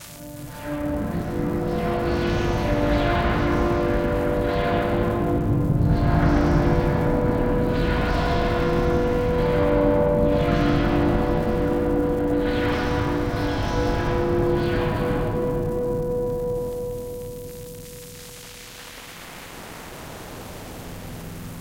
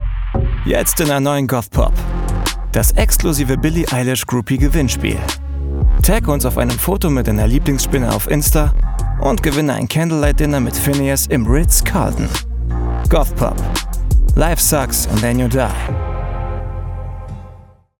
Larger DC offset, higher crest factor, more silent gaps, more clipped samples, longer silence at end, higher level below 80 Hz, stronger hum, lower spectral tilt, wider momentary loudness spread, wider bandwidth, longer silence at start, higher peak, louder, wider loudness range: neither; about the same, 16 dB vs 14 dB; neither; neither; second, 0 s vs 0.45 s; second, -30 dBFS vs -18 dBFS; neither; first, -7 dB/octave vs -5 dB/octave; first, 17 LU vs 8 LU; about the same, 17 kHz vs 18 kHz; about the same, 0 s vs 0 s; second, -6 dBFS vs -2 dBFS; second, -22 LUFS vs -16 LUFS; first, 14 LU vs 1 LU